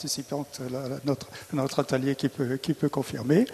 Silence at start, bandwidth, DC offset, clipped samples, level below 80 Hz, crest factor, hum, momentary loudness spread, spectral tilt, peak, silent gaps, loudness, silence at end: 0 s; 13.5 kHz; under 0.1%; under 0.1%; -62 dBFS; 20 dB; none; 8 LU; -5.5 dB/octave; -8 dBFS; none; -29 LUFS; 0 s